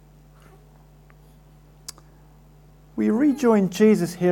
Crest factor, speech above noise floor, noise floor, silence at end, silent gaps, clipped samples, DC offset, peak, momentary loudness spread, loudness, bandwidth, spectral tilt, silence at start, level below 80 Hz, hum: 18 dB; 32 dB; -50 dBFS; 0 s; none; under 0.1%; under 0.1%; -6 dBFS; 23 LU; -20 LUFS; 17 kHz; -6.5 dB/octave; 2.95 s; -54 dBFS; none